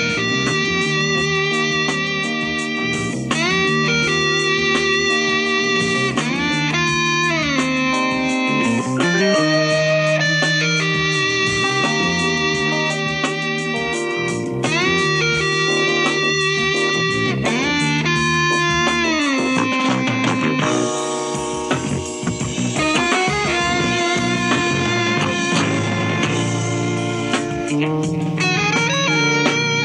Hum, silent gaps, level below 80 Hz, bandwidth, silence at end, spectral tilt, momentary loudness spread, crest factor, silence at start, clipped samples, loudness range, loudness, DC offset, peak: none; none; -46 dBFS; 11 kHz; 0 s; -4 dB/octave; 5 LU; 14 dB; 0 s; under 0.1%; 3 LU; -17 LUFS; under 0.1%; -4 dBFS